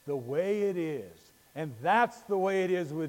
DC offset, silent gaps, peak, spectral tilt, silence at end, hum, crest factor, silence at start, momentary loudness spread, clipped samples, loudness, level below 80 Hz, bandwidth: under 0.1%; none; -12 dBFS; -6.5 dB/octave; 0 s; none; 18 dB; 0.05 s; 14 LU; under 0.1%; -30 LUFS; -76 dBFS; 17 kHz